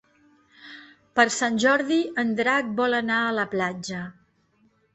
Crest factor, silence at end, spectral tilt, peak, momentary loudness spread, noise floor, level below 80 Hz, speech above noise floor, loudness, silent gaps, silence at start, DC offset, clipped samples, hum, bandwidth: 22 dB; 0.85 s; -3.5 dB/octave; -4 dBFS; 17 LU; -64 dBFS; -66 dBFS; 41 dB; -23 LUFS; none; 0.6 s; under 0.1%; under 0.1%; none; 8.4 kHz